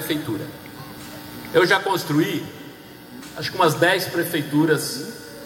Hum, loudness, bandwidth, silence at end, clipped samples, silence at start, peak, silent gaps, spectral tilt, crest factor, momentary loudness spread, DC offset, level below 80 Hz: none; -21 LUFS; 17 kHz; 0 s; under 0.1%; 0 s; -4 dBFS; none; -4.5 dB/octave; 20 dB; 20 LU; under 0.1%; -60 dBFS